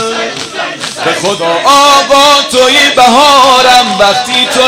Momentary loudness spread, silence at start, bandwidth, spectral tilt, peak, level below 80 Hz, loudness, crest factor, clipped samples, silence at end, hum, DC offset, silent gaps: 12 LU; 0 s; 17 kHz; -1.5 dB/octave; 0 dBFS; -42 dBFS; -6 LUFS; 6 dB; 3%; 0 s; none; under 0.1%; none